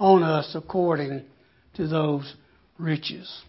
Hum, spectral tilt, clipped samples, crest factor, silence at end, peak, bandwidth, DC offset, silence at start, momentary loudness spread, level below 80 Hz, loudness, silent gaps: none; -11 dB/octave; under 0.1%; 20 dB; 0.05 s; -6 dBFS; 5.8 kHz; under 0.1%; 0 s; 14 LU; -60 dBFS; -25 LUFS; none